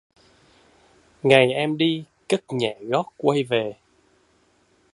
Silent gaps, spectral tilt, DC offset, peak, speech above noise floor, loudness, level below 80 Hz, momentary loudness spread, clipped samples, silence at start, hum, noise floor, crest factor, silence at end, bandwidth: none; -5.5 dB/octave; under 0.1%; 0 dBFS; 41 dB; -22 LUFS; -66 dBFS; 10 LU; under 0.1%; 1.25 s; none; -62 dBFS; 24 dB; 1.2 s; 11.5 kHz